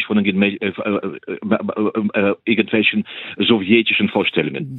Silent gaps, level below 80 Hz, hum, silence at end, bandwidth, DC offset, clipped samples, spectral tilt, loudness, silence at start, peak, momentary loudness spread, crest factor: none; -64 dBFS; none; 0 s; 4.2 kHz; under 0.1%; under 0.1%; -9 dB/octave; -18 LUFS; 0 s; 0 dBFS; 9 LU; 18 dB